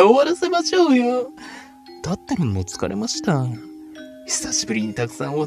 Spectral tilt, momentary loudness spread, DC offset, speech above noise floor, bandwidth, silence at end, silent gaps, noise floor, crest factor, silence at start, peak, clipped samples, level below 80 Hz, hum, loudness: -4.5 dB/octave; 22 LU; under 0.1%; 19 dB; 14 kHz; 0 s; none; -39 dBFS; 20 dB; 0 s; 0 dBFS; under 0.1%; -52 dBFS; none; -21 LUFS